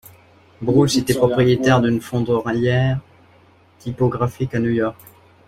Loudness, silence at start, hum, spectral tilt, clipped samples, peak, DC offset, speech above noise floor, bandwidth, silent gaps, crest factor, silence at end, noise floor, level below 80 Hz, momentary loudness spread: -19 LUFS; 0.6 s; none; -6.5 dB/octave; under 0.1%; -2 dBFS; under 0.1%; 34 dB; 15 kHz; none; 16 dB; 0.55 s; -52 dBFS; -46 dBFS; 10 LU